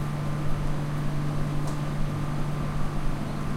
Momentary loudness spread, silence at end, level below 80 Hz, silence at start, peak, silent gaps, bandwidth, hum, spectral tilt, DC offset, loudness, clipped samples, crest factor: 2 LU; 0 s; -32 dBFS; 0 s; -14 dBFS; none; 13 kHz; none; -7 dB/octave; under 0.1%; -30 LUFS; under 0.1%; 12 dB